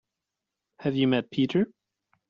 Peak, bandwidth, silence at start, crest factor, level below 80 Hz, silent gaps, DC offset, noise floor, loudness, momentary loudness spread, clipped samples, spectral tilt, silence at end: -12 dBFS; 7 kHz; 0.8 s; 18 dB; -68 dBFS; none; under 0.1%; -86 dBFS; -27 LUFS; 8 LU; under 0.1%; -5.5 dB/octave; 0.65 s